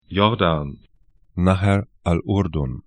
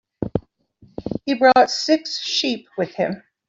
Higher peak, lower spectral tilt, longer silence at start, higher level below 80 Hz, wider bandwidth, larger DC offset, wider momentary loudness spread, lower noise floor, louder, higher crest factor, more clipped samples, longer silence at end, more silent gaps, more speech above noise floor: about the same, 0 dBFS vs -2 dBFS; first, -7.5 dB/octave vs -4 dB/octave; about the same, 0.1 s vs 0.2 s; first, -38 dBFS vs -52 dBFS; first, 10 kHz vs 7.8 kHz; neither; second, 8 LU vs 15 LU; about the same, -56 dBFS vs -54 dBFS; about the same, -21 LUFS vs -20 LUFS; about the same, 20 dB vs 18 dB; neither; second, 0.05 s vs 0.3 s; neither; about the same, 36 dB vs 35 dB